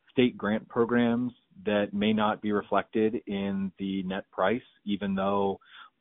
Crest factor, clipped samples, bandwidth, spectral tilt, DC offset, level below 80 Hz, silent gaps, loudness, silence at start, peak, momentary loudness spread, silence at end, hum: 20 dB; under 0.1%; 4 kHz; -5 dB/octave; under 0.1%; -62 dBFS; none; -29 LUFS; 0.15 s; -10 dBFS; 8 LU; 0.15 s; none